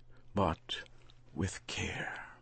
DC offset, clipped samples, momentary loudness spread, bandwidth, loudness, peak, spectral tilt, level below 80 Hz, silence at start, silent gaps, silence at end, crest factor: under 0.1%; under 0.1%; 9 LU; 8.8 kHz; -38 LUFS; -16 dBFS; -4.5 dB/octave; -54 dBFS; 0 s; none; 0 s; 22 dB